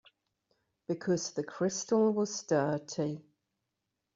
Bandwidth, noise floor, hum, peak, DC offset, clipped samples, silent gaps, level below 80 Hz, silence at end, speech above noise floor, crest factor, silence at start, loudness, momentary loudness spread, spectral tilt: 7.8 kHz; -86 dBFS; none; -16 dBFS; under 0.1%; under 0.1%; none; -74 dBFS; 0.95 s; 54 dB; 18 dB; 0.9 s; -32 LUFS; 10 LU; -6 dB/octave